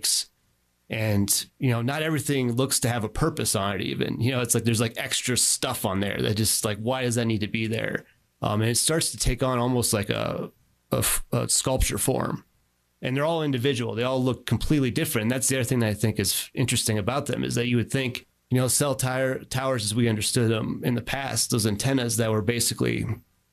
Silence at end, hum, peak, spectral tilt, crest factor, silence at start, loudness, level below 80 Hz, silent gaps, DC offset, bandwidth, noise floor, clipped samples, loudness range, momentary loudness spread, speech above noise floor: 0.3 s; none; -8 dBFS; -4 dB/octave; 18 dB; 0 s; -25 LUFS; -44 dBFS; none; under 0.1%; 14.5 kHz; -68 dBFS; under 0.1%; 2 LU; 6 LU; 43 dB